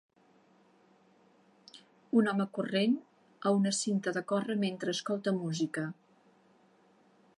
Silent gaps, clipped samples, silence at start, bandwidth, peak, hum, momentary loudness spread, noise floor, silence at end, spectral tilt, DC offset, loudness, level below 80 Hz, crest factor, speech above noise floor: none; under 0.1%; 1.75 s; 11.5 kHz; -16 dBFS; none; 7 LU; -66 dBFS; 1.45 s; -5 dB/octave; under 0.1%; -32 LUFS; -84 dBFS; 18 dB; 35 dB